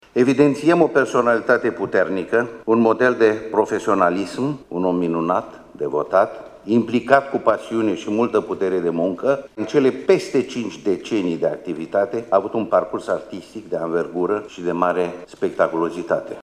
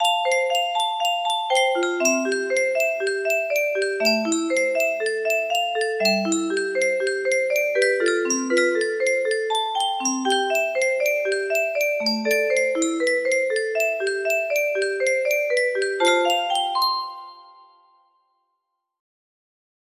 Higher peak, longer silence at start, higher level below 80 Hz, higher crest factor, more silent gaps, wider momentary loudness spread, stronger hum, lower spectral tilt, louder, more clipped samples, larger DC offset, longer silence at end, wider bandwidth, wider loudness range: first, 0 dBFS vs -6 dBFS; first, 0.15 s vs 0 s; first, -60 dBFS vs -74 dBFS; about the same, 18 dB vs 16 dB; neither; first, 9 LU vs 3 LU; neither; first, -6.5 dB/octave vs -1.5 dB/octave; about the same, -20 LUFS vs -21 LUFS; neither; neither; second, 0 s vs 2.6 s; second, 11.5 kHz vs 15.5 kHz; about the same, 4 LU vs 2 LU